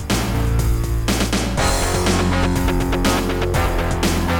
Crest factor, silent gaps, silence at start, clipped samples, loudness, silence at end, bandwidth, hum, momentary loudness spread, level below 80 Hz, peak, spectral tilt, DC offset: 14 dB; none; 0 s; under 0.1%; -19 LUFS; 0 s; over 20 kHz; none; 3 LU; -24 dBFS; -4 dBFS; -5 dB/octave; under 0.1%